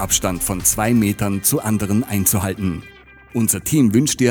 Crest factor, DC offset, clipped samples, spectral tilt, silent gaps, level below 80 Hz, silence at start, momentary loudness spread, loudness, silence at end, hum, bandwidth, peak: 16 dB; under 0.1%; under 0.1%; -4.5 dB/octave; none; -40 dBFS; 0 s; 8 LU; -18 LUFS; 0 s; none; over 20 kHz; -2 dBFS